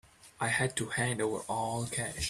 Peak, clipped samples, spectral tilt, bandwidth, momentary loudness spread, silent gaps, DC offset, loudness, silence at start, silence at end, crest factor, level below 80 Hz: -16 dBFS; under 0.1%; -3.5 dB/octave; 14.5 kHz; 4 LU; none; under 0.1%; -33 LUFS; 0.25 s; 0 s; 18 dB; -56 dBFS